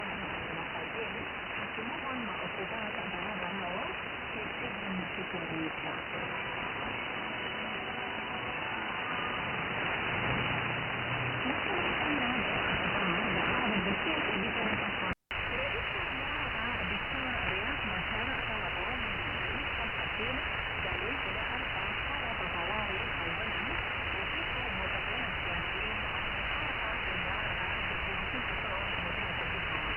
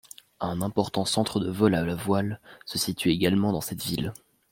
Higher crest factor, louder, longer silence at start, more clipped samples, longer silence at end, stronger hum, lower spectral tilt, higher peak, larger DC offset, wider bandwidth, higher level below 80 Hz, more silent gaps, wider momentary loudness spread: about the same, 18 dB vs 20 dB; second, -33 LUFS vs -27 LUFS; second, 0 s vs 0.4 s; neither; second, 0 s vs 0.35 s; neither; first, -7 dB/octave vs -5 dB/octave; second, -16 dBFS vs -6 dBFS; neither; about the same, 15.5 kHz vs 16.5 kHz; first, -48 dBFS vs -56 dBFS; neither; second, 6 LU vs 10 LU